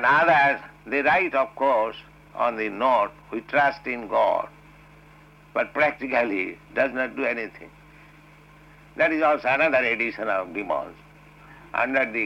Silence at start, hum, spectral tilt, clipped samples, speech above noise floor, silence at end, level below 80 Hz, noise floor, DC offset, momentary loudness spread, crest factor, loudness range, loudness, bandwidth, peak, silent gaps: 0 s; none; -6 dB/octave; under 0.1%; 27 dB; 0 s; -58 dBFS; -51 dBFS; under 0.1%; 11 LU; 16 dB; 3 LU; -23 LUFS; 9.8 kHz; -10 dBFS; none